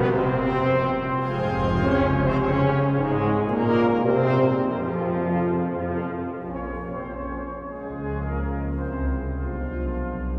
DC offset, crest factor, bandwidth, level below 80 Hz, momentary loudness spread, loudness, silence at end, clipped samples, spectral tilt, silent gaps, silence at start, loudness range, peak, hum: under 0.1%; 16 dB; 6.6 kHz; -34 dBFS; 11 LU; -24 LUFS; 0 s; under 0.1%; -9.5 dB/octave; none; 0 s; 8 LU; -8 dBFS; none